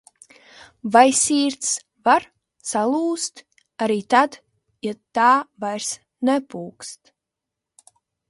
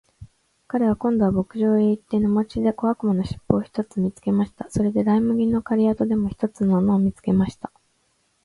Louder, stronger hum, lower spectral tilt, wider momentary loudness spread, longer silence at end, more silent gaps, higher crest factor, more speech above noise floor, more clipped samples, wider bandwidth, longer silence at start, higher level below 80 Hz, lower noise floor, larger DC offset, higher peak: about the same, -20 LUFS vs -22 LUFS; neither; second, -2.5 dB/octave vs -9 dB/octave; first, 18 LU vs 6 LU; first, 1.35 s vs 0.75 s; neither; about the same, 22 dB vs 22 dB; first, 64 dB vs 46 dB; neither; about the same, 11.5 kHz vs 11.5 kHz; first, 0.85 s vs 0.2 s; second, -68 dBFS vs -48 dBFS; first, -84 dBFS vs -67 dBFS; neither; about the same, 0 dBFS vs 0 dBFS